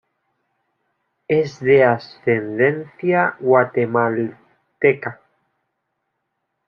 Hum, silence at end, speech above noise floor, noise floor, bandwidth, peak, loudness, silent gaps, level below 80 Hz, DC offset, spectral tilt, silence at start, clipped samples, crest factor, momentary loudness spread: none; 1.55 s; 58 dB; -75 dBFS; 6.8 kHz; -2 dBFS; -18 LUFS; none; -66 dBFS; under 0.1%; -8 dB/octave; 1.3 s; under 0.1%; 18 dB; 10 LU